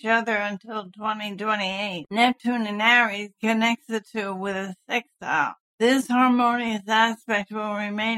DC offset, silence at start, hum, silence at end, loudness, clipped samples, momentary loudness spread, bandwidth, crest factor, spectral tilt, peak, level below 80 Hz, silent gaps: under 0.1%; 0.05 s; none; 0 s; -23 LUFS; under 0.1%; 11 LU; 14.5 kHz; 18 dB; -4 dB/octave; -6 dBFS; -72 dBFS; 5.60-5.78 s